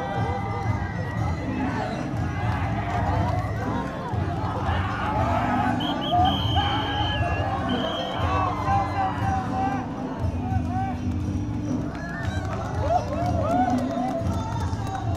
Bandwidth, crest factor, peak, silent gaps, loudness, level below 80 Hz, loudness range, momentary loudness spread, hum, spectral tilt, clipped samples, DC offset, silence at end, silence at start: 13 kHz; 16 dB; -10 dBFS; none; -26 LUFS; -38 dBFS; 3 LU; 6 LU; none; -6.5 dB/octave; under 0.1%; under 0.1%; 0 s; 0 s